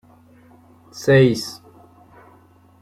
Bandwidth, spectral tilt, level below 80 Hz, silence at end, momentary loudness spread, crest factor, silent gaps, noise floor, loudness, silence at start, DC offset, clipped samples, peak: 14.5 kHz; -6 dB/octave; -58 dBFS; 1.3 s; 26 LU; 20 dB; none; -52 dBFS; -17 LUFS; 0.95 s; under 0.1%; under 0.1%; -2 dBFS